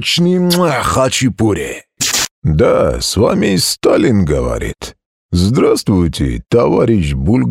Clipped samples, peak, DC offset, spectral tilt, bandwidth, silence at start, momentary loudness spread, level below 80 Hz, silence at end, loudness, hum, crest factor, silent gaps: under 0.1%; 0 dBFS; under 0.1%; -5 dB/octave; 16.5 kHz; 0 s; 8 LU; -28 dBFS; 0 s; -13 LUFS; none; 12 dB; 2.31-2.42 s, 5.06-5.29 s